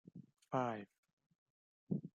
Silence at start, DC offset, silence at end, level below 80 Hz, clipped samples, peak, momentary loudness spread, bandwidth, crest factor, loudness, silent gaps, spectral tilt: 0.15 s; under 0.1%; 0.1 s; -88 dBFS; under 0.1%; -24 dBFS; 20 LU; 10 kHz; 22 dB; -43 LUFS; 0.98-1.03 s, 1.13-1.17 s, 1.26-1.30 s, 1.38-1.87 s; -8 dB/octave